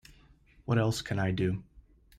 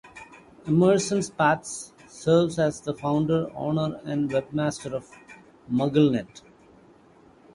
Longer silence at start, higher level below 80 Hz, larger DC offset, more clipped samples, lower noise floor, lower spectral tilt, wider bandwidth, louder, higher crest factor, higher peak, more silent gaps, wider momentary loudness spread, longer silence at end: first, 0.65 s vs 0.05 s; about the same, -56 dBFS vs -58 dBFS; neither; neither; first, -60 dBFS vs -55 dBFS; about the same, -6 dB/octave vs -6 dB/octave; first, 15.5 kHz vs 11.5 kHz; second, -31 LUFS vs -25 LUFS; about the same, 16 dB vs 18 dB; second, -16 dBFS vs -6 dBFS; neither; second, 10 LU vs 15 LU; second, 0.4 s vs 1.15 s